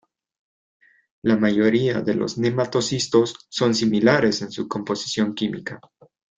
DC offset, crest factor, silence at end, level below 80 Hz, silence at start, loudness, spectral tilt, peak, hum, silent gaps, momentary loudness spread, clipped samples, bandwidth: under 0.1%; 20 dB; 0.6 s; -60 dBFS; 1.25 s; -21 LUFS; -5 dB/octave; -2 dBFS; none; none; 10 LU; under 0.1%; 9.2 kHz